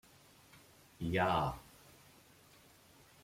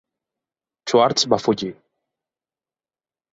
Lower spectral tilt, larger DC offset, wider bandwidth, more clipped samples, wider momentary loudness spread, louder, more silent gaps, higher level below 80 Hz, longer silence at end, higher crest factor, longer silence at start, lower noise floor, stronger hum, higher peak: first, -6 dB/octave vs -4 dB/octave; neither; first, 16.5 kHz vs 8 kHz; neither; first, 27 LU vs 14 LU; second, -36 LUFS vs -19 LUFS; neither; about the same, -62 dBFS vs -62 dBFS; about the same, 1.6 s vs 1.6 s; about the same, 22 dB vs 22 dB; second, 0.55 s vs 0.85 s; second, -63 dBFS vs under -90 dBFS; neither; second, -18 dBFS vs -2 dBFS